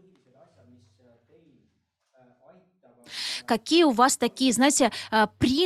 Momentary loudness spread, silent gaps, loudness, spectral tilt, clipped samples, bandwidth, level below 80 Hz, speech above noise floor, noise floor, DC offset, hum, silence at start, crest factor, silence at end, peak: 11 LU; none; -23 LUFS; -3 dB/octave; under 0.1%; 15 kHz; -58 dBFS; 49 dB; -73 dBFS; under 0.1%; none; 3.1 s; 20 dB; 0 s; -6 dBFS